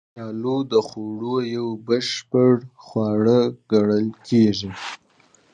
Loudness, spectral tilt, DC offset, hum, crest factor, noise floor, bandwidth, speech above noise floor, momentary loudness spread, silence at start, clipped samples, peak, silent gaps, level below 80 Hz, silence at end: -21 LUFS; -6.5 dB/octave; under 0.1%; none; 16 dB; -57 dBFS; 9.4 kHz; 37 dB; 13 LU; 0.15 s; under 0.1%; -4 dBFS; none; -58 dBFS; 0.6 s